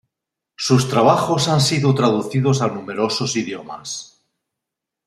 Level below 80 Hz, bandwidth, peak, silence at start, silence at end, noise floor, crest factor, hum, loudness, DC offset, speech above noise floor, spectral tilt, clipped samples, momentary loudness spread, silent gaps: -58 dBFS; 13.5 kHz; -2 dBFS; 0.6 s; 1 s; -83 dBFS; 18 dB; none; -18 LUFS; under 0.1%; 65 dB; -5 dB/octave; under 0.1%; 14 LU; none